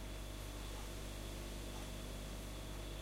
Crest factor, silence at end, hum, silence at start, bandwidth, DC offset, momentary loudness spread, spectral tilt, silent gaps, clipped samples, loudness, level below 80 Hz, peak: 12 dB; 0 s; 50 Hz at -50 dBFS; 0 s; 16 kHz; under 0.1%; 1 LU; -4 dB/octave; none; under 0.1%; -48 LUFS; -50 dBFS; -34 dBFS